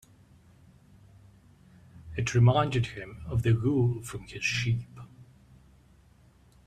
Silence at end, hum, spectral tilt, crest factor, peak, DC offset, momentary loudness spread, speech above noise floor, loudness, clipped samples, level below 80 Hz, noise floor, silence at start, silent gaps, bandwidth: 1.6 s; none; -6 dB/octave; 18 dB; -12 dBFS; under 0.1%; 18 LU; 33 dB; -28 LUFS; under 0.1%; -52 dBFS; -59 dBFS; 1.95 s; none; 10 kHz